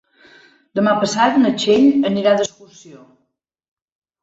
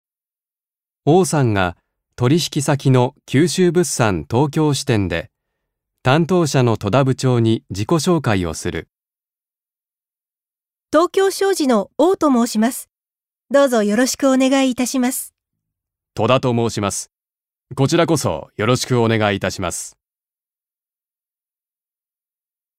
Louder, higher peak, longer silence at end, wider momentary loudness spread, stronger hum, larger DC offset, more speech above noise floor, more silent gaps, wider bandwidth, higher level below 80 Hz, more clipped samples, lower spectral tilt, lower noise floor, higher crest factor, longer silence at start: about the same, -16 LUFS vs -17 LUFS; about the same, -2 dBFS vs 0 dBFS; second, 1.25 s vs 2.9 s; about the same, 7 LU vs 8 LU; neither; neither; second, 54 dB vs over 74 dB; neither; second, 8 kHz vs 16 kHz; second, -62 dBFS vs -50 dBFS; neither; about the same, -5 dB/octave vs -5.5 dB/octave; second, -70 dBFS vs under -90 dBFS; about the same, 16 dB vs 18 dB; second, 0.75 s vs 1.05 s